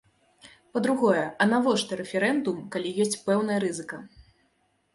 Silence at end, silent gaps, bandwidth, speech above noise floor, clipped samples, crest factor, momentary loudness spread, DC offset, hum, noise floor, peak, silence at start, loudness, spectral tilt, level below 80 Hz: 0.9 s; none; 11.5 kHz; 44 dB; under 0.1%; 20 dB; 10 LU; under 0.1%; none; -70 dBFS; -8 dBFS; 0.45 s; -26 LUFS; -4.5 dB/octave; -66 dBFS